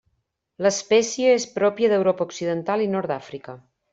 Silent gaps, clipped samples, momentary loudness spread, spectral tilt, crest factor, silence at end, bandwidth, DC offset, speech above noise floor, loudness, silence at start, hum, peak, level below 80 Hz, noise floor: none; under 0.1%; 12 LU; -4 dB/octave; 16 dB; 0.35 s; 8 kHz; under 0.1%; 50 dB; -22 LUFS; 0.6 s; none; -6 dBFS; -66 dBFS; -72 dBFS